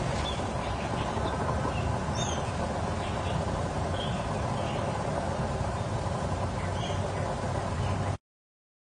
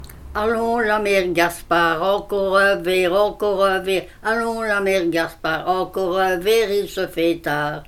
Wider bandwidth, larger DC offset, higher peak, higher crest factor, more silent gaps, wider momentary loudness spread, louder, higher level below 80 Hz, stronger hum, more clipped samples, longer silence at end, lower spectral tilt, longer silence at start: second, 10 kHz vs 17 kHz; neither; second, -16 dBFS vs -2 dBFS; about the same, 14 dB vs 18 dB; neither; second, 2 LU vs 6 LU; second, -31 LUFS vs -19 LUFS; about the same, -42 dBFS vs -44 dBFS; neither; neither; first, 0.8 s vs 0.05 s; about the same, -5.5 dB/octave vs -4.5 dB/octave; about the same, 0 s vs 0 s